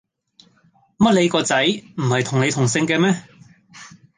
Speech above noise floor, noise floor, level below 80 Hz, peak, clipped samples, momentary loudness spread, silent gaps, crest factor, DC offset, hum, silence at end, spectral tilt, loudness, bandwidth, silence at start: 40 dB; -58 dBFS; -56 dBFS; -4 dBFS; under 0.1%; 5 LU; none; 18 dB; under 0.1%; none; 0.3 s; -4.5 dB/octave; -18 LUFS; 10 kHz; 1 s